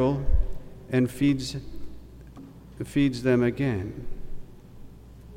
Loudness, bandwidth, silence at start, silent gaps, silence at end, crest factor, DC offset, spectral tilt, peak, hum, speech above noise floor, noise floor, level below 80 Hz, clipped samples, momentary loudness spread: -26 LUFS; 16 kHz; 0 s; none; 0 s; 18 dB; under 0.1%; -7 dB/octave; -10 dBFS; none; 21 dB; -45 dBFS; -34 dBFS; under 0.1%; 24 LU